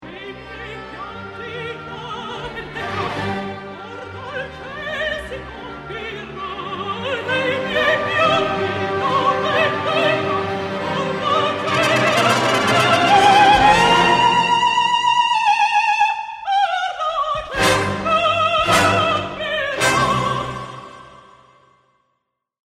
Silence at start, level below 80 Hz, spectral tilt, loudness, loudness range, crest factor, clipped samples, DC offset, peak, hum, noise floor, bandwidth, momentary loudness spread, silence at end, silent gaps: 0 s; -46 dBFS; -3.5 dB/octave; -17 LUFS; 14 LU; 18 dB; under 0.1%; under 0.1%; -2 dBFS; none; -74 dBFS; 16 kHz; 18 LU; 1.5 s; none